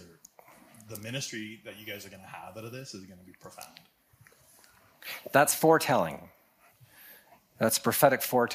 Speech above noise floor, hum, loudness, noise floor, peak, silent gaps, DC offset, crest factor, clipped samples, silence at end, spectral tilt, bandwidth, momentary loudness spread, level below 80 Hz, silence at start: 32 dB; none; -26 LUFS; -61 dBFS; -8 dBFS; none; under 0.1%; 24 dB; under 0.1%; 0 s; -3.5 dB/octave; 15.5 kHz; 23 LU; -74 dBFS; 0 s